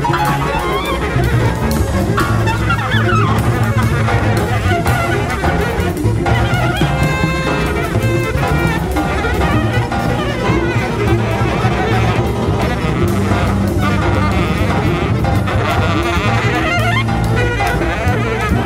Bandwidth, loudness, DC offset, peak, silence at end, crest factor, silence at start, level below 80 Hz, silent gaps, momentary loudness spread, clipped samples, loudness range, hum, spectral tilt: 16 kHz; -15 LUFS; under 0.1%; -2 dBFS; 0 s; 14 dB; 0 s; -24 dBFS; none; 2 LU; under 0.1%; 1 LU; none; -6.5 dB/octave